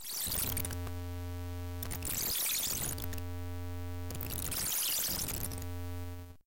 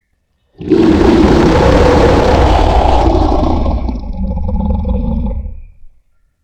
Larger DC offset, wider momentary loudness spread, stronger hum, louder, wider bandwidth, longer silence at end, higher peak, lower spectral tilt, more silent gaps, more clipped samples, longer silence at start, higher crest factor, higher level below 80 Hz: neither; about the same, 11 LU vs 13 LU; neither; second, -35 LUFS vs -11 LUFS; first, 17 kHz vs 9.4 kHz; second, 0.05 s vs 0.55 s; second, -24 dBFS vs 0 dBFS; second, -2.5 dB/octave vs -7.5 dB/octave; neither; neither; second, 0 s vs 0.6 s; about the same, 14 dB vs 10 dB; second, -48 dBFS vs -16 dBFS